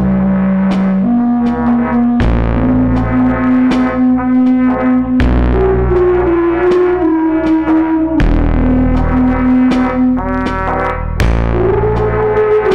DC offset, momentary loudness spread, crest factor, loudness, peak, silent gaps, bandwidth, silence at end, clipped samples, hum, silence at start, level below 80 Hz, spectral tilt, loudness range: 1%; 2 LU; 6 dB; -12 LUFS; -6 dBFS; none; 6.6 kHz; 0 s; under 0.1%; none; 0 s; -20 dBFS; -9 dB/octave; 2 LU